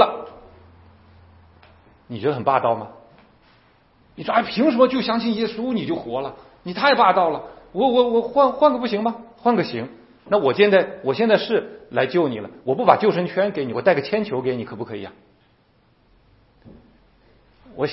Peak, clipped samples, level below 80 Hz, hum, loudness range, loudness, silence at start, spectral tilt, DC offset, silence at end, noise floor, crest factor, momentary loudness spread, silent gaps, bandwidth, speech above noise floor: 0 dBFS; under 0.1%; -60 dBFS; none; 8 LU; -20 LUFS; 0 s; -9.5 dB/octave; under 0.1%; 0 s; -59 dBFS; 22 dB; 16 LU; none; 5.8 kHz; 39 dB